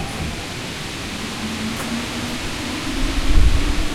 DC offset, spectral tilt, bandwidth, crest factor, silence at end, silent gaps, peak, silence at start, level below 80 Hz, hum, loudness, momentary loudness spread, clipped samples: under 0.1%; -4 dB/octave; 15 kHz; 18 dB; 0 s; none; -2 dBFS; 0 s; -22 dBFS; none; -24 LUFS; 8 LU; under 0.1%